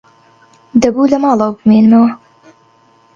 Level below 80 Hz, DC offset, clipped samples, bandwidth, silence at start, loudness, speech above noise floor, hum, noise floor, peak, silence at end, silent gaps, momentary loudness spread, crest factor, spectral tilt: -50 dBFS; under 0.1%; under 0.1%; 7.4 kHz; 0.75 s; -11 LUFS; 40 dB; none; -49 dBFS; 0 dBFS; 1 s; none; 8 LU; 12 dB; -7 dB/octave